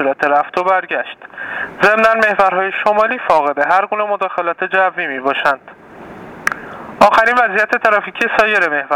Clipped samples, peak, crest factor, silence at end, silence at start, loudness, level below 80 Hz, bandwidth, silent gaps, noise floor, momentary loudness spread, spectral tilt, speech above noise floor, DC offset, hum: under 0.1%; 0 dBFS; 14 dB; 0 s; 0 s; -14 LUFS; -54 dBFS; 17.5 kHz; none; -34 dBFS; 12 LU; -4 dB/octave; 19 dB; under 0.1%; none